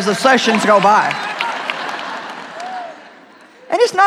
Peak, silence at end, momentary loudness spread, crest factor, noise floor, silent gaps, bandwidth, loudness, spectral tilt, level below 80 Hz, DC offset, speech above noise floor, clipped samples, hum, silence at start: 0 dBFS; 0 s; 17 LU; 16 dB; -43 dBFS; none; 15.5 kHz; -15 LUFS; -3.5 dB/octave; -70 dBFS; under 0.1%; 30 dB; under 0.1%; none; 0 s